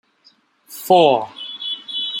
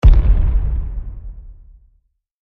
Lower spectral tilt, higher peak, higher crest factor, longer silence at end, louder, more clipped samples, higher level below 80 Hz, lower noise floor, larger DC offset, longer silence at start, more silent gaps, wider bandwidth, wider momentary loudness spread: second, -4.5 dB/octave vs -9 dB/octave; about the same, -2 dBFS vs 0 dBFS; about the same, 18 dB vs 14 dB; second, 0 s vs 0.9 s; about the same, -17 LUFS vs -19 LUFS; neither; second, -70 dBFS vs -16 dBFS; second, -56 dBFS vs -61 dBFS; neither; first, 0.7 s vs 0.05 s; neither; first, 17 kHz vs 3.9 kHz; second, 19 LU vs 23 LU